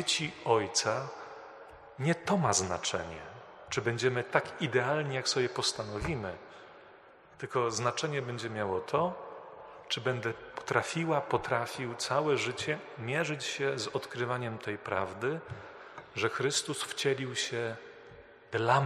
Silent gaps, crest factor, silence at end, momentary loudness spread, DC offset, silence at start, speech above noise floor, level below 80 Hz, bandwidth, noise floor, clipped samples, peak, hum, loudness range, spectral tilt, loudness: none; 24 dB; 0 s; 18 LU; under 0.1%; 0 s; 24 dB; -62 dBFS; 13 kHz; -57 dBFS; under 0.1%; -8 dBFS; none; 3 LU; -3.5 dB/octave; -32 LUFS